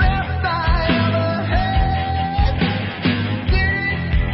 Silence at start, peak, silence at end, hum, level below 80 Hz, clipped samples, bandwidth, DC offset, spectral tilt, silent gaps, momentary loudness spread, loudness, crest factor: 0 s; -4 dBFS; 0 s; none; -22 dBFS; under 0.1%; 5.8 kHz; 0.1%; -11 dB/octave; none; 3 LU; -19 LUFS; 14 dB